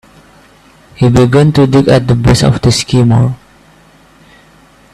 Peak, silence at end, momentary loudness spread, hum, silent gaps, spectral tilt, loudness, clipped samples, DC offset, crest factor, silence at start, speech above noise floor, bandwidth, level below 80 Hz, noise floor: 0 dBFS; 1.6 s; 5 LU; none; none; -6.5 dB/octave; -9 LUFS; under 0.1%; under 0.1%; 10 dB; 1 s; 35 dB; 13 kHz; -32 dBFS; -43 dBFS